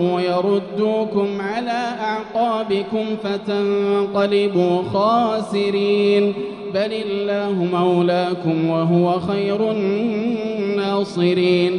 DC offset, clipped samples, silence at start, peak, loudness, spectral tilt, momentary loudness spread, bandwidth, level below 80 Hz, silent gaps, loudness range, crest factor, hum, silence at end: under 0.1%; under 0.1%; 0 s; -6 dBFS; -19 LUFS; -7.5 dB/octave; 6 LU; 10 kHz; -62 dBFS; none; 3 LU; 14 dB; none; 0 s